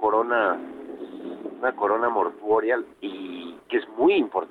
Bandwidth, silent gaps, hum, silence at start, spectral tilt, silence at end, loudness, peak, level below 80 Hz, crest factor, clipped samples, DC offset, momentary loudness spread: 4.4 kHz; none; none; 0 s; -6.5 dB/octave; 0.05 s; -24 LUFS; -10 dBFS; -68 dBFS; 14 dB; under 0.1%; under 0.1%; 16 LU